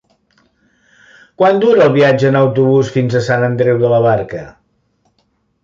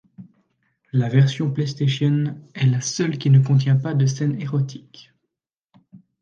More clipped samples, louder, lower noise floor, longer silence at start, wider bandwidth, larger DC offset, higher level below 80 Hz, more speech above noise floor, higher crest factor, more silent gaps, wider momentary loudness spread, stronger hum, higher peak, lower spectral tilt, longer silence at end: neither; first, -12 LUFS vs -20 LUFS; second, -62 dBFS vs -81 dBFS; first, 1.4 s vs 0.2 s; about the same, 7.6 kHz vs 7.2 kHz; neither; first, -52 dBFS vs -64 dBFS; second, 50 dB vs 62 dB; about the same, 12 dB vs 16 dB; second, none vs 5.64-5.68 s; about the same, 6 LU vs 8 LU; neither; first, 0 dBFS vs -6 dBFS; about the same, -7.5 dB/octave vs -6.5 dB/octave; first, 1.15 s vs 0.25 s